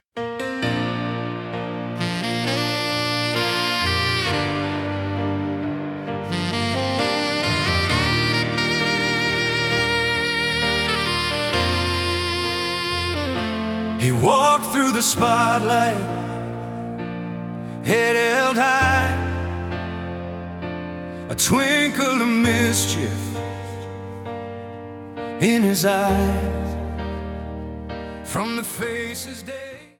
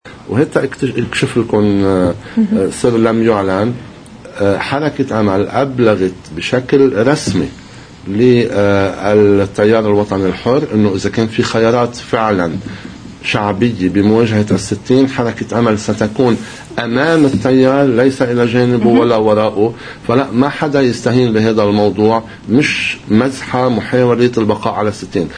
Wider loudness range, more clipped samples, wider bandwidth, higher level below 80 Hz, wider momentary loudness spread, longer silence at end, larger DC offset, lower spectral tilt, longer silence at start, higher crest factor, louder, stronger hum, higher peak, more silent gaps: about the same, 4 LU vs 3 LU; neither; first, 18 kHz vs 10.5 kHz; about the same, -42 dBFS vs -42 dBFS; first, 14 LU vs 7 LU; first, 0.15 s vs 0 s; neither; second, -4 dB/octave vs -6.5 dB/octave; about the same, 0.15 s vs 0.05 s; first, 18 dB vs 12 dB; second, -21 LUFS vs -13 LUFS; neither; second, -4 dBFS vs 0 dBFS; neither